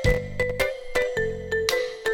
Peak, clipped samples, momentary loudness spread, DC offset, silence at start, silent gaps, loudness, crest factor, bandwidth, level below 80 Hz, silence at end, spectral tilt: -2 dBFS; under 0.1%; 3 LU; under 0.1%; 0 s; none; -26 LUFS; 24 dB; 19 kHz; -36 dBFS; 0 s; -4 dB/octave